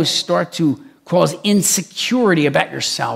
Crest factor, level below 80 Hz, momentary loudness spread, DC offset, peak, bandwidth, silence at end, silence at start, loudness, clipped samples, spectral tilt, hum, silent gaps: 16 dB; -62 dBFS; 5 LU; under 0.1%; 0 dBFS; 16.5 kHz; 0 s; 0 s; -16 LUFS; under 0.1%; -3.5 dB/octave; none; none